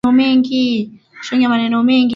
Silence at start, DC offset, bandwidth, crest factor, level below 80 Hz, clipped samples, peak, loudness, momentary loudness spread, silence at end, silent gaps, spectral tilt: 0.05 s; under 0.1%; 7.2 kHz; 12 dB; -54 dBFS; under 0.1%; -2 dBFS; -15 LUFS; 12 LU; 0 s; none; -5.5 dB/octave